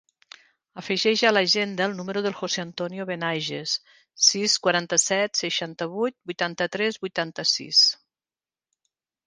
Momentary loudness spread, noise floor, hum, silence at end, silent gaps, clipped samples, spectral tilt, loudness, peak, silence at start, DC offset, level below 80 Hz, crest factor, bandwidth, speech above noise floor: 10 LU; under -90 dBFS; none; 1.35 s; none; under 0.1%; -2 dB/octave; -23 LUFS; -4 dBFS; 0.75 s; under 0.1%; -74 dBFS; 22 dB; 10.5 kHz; over 65 dB